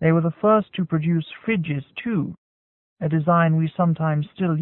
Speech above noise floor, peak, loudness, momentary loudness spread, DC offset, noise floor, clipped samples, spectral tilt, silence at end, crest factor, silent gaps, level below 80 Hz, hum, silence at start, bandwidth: over 69 dB; -6 dBFS; -22 LUFS; 8 LU; under 0.1%; under -90 dBFS; under 0.1%; -12.5 dB/octave; 0 s; 16 dB; 2.38-2.96 s; -60 dBFS; none; 0 s; 4 kHz